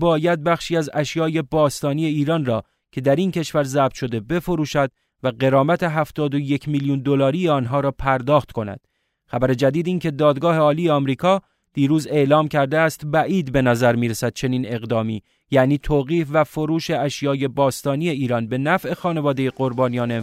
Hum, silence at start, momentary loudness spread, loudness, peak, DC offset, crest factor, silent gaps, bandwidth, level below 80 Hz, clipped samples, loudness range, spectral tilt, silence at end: none; 0 s; 6 LU; -20 LUFS; -2 dBFS; under 0.1%; 16 dB; none; 16 kHz; -46 dBFS; under 0.1%; 3 LU; -6.5 dB/octave; 0 s